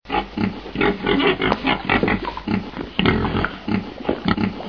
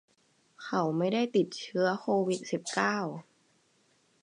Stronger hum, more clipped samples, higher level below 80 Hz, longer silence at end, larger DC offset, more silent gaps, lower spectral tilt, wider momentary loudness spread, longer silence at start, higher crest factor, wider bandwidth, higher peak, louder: neither; neither; first, -38 dBFS vs -82 dBFS; second, 0 s vs 1 s; first, 0.2% vs under 0.1%; neither; first, -7.5 dB/octave vs -5 dB/octave; about the same, 7 LU vs 7 LU; second, 0.05 s vs 0.6 s; about the same, 20 dB vs 20 dB; second, 5.4 kHz vs 11 kHz; first, 0 dBFS vs -12 dBFS; first, -21 LUFS vs -30 LUFS